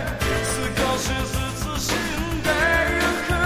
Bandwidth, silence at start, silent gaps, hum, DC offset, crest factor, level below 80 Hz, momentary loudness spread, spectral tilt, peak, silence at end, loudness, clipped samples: 16 kHz; 0 s; none; none; under 0.1%; 16 dB; -32 dBFS; 7 LU; -4 dB/octave; -6 dBFS; 0 s; -22 LUFS; under 0.1%